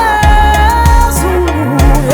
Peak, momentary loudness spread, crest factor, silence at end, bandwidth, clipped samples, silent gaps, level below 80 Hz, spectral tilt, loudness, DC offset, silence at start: 0 dBFS; 4 LU; 8 dB; 0 s; over 20 kHz; 0.7%; none; -12 dBFS; -5.5 dB/octave; -9 LUFS; under 0.1%; 0 s